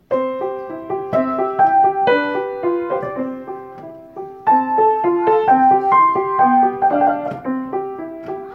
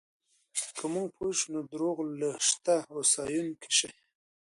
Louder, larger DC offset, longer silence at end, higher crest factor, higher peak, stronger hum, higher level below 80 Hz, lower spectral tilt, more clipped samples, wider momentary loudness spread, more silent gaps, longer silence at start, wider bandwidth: first, -17 LUFS vs -30 LUFS; neither; second, 0 s vs 0.6 s; second, 14 dB vs 20 dB; first, -2 dBFS vs -12 dBFS; neither; first, -60 dBFS vs -74 dBFS; first, -8 dB/octave vs -2 dB/octave; neither; first, 17 LU vs 8 LU; neither; second, 0.1 s vs 0.55 s; second, 5 kHz vs 11.5 kHz